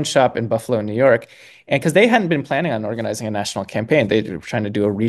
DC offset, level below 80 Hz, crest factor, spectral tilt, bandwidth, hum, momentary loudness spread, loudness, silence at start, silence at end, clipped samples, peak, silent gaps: under 0.1%; -58 dBFS; 18 dB; -5.5 dB/octave; 12.5 kHz; none; 9 LU; -19 LUFS; 0 s; 0 s; under 0.1%; 0 dBFS; none